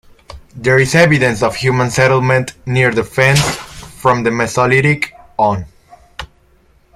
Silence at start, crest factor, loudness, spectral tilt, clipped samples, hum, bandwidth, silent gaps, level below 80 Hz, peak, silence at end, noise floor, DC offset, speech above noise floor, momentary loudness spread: 0.3 s; 14 dB; -13 LUFS; -5 dB/octave; under 0.1%; none; 15 kHz; none; -40 dBFS; 0 dBFS; 0.7 s; -51 dBFS; under 0.1%; 38 dB; 14 LU